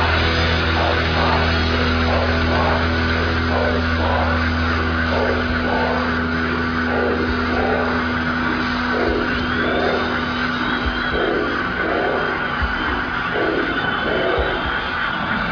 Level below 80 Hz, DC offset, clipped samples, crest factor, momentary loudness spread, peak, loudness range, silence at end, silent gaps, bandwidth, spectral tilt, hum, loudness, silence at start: -30 dBFS; under 0.1%; under 0.1%; 14 dB; 3 LU; -6 dBFS; 2 LU; 0 s; none; 5.4 kHz; -6.5 dB/octave; none; -19 LUFS; 0 s